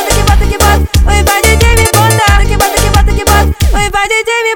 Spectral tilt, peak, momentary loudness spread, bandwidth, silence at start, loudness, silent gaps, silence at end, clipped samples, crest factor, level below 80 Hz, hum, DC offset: -4 dB/octave; 0 dBFS; 3 LU; 19 kHz; 0 s; -8 LUFS; none; 0 s; 0.4%; 8 dB; -12 dBFS; none; under 0.1%